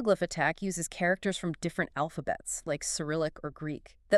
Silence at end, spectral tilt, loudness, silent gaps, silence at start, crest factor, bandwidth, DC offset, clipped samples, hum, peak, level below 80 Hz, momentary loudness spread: 0 s; -4 dB/octave; -32 LUFS; none; 0 s; 22 dB; 13.5 kHz; under 0.1%; under 0.1%; none; -10 dBFS; -58 dBFS; 9 LU